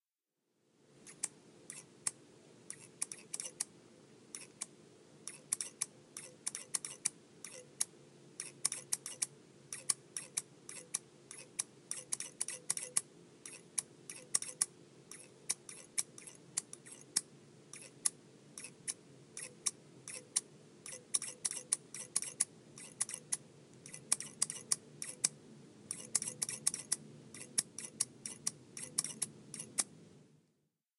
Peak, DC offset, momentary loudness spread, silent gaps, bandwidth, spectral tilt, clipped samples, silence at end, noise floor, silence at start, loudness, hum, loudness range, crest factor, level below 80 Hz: -10 dBFS; under 0.1%; 16 LU; none; 15.5 kHz; 0 dB/octave; under 0.1%; 0.75 s; -89 dBFS; 0.95 s; -39 LUFS; none; 6 LU; 34 dB; -88 dBFS